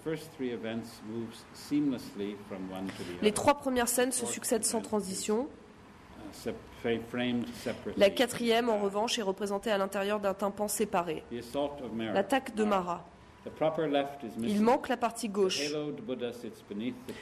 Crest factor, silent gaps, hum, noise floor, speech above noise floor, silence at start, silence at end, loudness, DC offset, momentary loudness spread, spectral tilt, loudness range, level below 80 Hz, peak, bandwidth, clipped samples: 20 dB; none; none; -53 dBFS; 21 dB; 0 s; 0 s; -32 LUFS; under 0.1%; 13 LU; -4 dB/octave; 4 LU; -62 dBFS; -12 dBFS; 13.5 kHz; under 0.1%